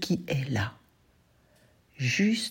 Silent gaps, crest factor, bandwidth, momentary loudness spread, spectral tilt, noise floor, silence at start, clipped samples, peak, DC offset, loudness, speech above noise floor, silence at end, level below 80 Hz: none; 16 dB; 16.5 kHz; 7 LU; -5 dB/octave; -64 dBFS; 0 s; under 0.1%; -14 dBFS; under 0.1%; -29 LUFS; 37 dB; 0 s; -62 dBFS